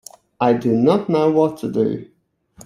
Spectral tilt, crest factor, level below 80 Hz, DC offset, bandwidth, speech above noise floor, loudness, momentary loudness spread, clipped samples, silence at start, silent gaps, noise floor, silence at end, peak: -7.5 dB/octave; 16 dB; -58 dBFS; under 0.1%; 14.5 kHz; 32 dB; -18 LUFS; 6 LU; under 0.1%; 0.4 s; none; -49 dBFS; 0.6 s; -2 dBFS